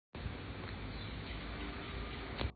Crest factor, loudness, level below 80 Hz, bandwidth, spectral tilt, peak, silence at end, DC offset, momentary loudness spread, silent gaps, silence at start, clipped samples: 20 dB; -44 LUFS; -48 dBFS; 4.8 kHz; -4 dB/octave; -22 dBFS; 0 s; under 0.1%; 2 LU; none; 0.15 s; under 0.1%